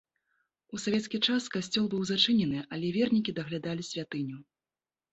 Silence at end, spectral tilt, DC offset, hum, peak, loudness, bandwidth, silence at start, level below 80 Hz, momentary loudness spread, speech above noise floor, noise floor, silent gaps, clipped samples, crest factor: 0.7 s; -4.5 dB/octave; under 0.1%; none; -10 dBFS; -30 LUFS; 8.2 kHz; 0.7 s; -68 dBFS; 11 LU; over 60 dB; under -90 dBFS; none; under 0.1%; 22 dB